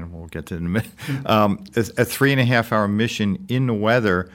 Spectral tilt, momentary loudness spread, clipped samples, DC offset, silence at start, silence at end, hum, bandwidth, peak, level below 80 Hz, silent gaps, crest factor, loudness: -6 dB/octave; 11 LU; under 0.1%; under 0.1%; 0 s; 0.05 s; none; 17 kHz; -2 dBFS; -48 dBFS; none; 18 dB; -20 LUFS